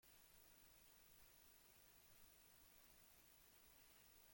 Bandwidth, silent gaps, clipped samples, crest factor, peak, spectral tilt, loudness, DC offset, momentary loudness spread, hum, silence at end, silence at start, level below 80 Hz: 17 kHz; none; under 0.1%; 16 dB; -54 dBFS; -1.5 dB/octave; -68 LUFS; under 0.1%; 0 LU; none; 0 s; 0 s; -82 dBFS